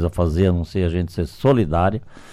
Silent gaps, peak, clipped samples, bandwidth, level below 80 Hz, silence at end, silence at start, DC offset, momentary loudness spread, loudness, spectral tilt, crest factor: none; -6 dBFS; under 0.1%; 12.5 kHz; -32 dBFS; 0 s; 0 s; under 0.1%; 7 LU; -20 LUFS; -8.5 dB/octave; 14 dB